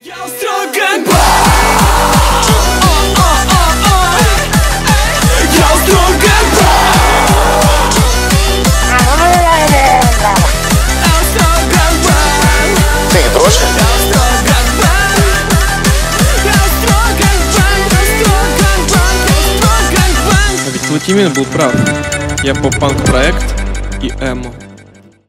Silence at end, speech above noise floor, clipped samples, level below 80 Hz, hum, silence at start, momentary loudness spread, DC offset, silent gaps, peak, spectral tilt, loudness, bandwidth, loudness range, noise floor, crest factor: 0.5 s; 28 dB; under 0.1%; -14 dBFS; none; 0.05 s; 6 LU; under 0.1%; none; 0 dBFS; -4 dB/octave; -9 LUFS; 16.5 kHz; 3 LU; -39 dBFS; 8 dB